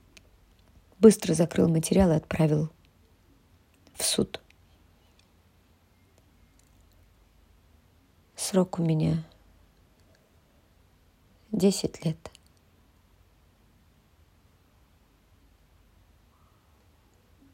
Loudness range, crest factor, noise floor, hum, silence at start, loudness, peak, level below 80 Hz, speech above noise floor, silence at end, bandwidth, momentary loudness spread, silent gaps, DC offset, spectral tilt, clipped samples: 10 LU; 26 dB; -62 dBFS; none; 1 s; -25 LUFS; -4 dBFS; -54 dBFS; 38 dB; 5.25 s; 16 kHz; 21 LU; none; under 0.1%; -5.5 dB/octave; under 0.1%